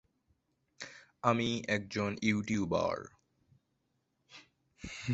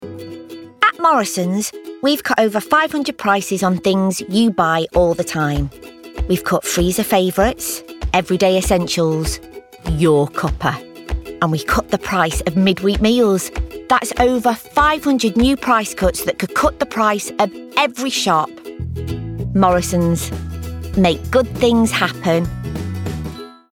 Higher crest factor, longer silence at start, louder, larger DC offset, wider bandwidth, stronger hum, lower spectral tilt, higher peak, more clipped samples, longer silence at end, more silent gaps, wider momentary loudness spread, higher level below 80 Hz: first, 24 dB vs 16 dB; first, 0.8 s vs 0 s; second, -33 LUFS vs -17 LUFS; neither; second, 8 kHz vs 18 kHz; neither; about the same, -4.5 dB/octave vs -5 dB/octave; second, -12 dBFS vs -2 dBFS; neither; second, 0 s vs 0.2 s; neither; first, 17 LU vs 12 LU; second, -62 dBFS vs -32 dBFS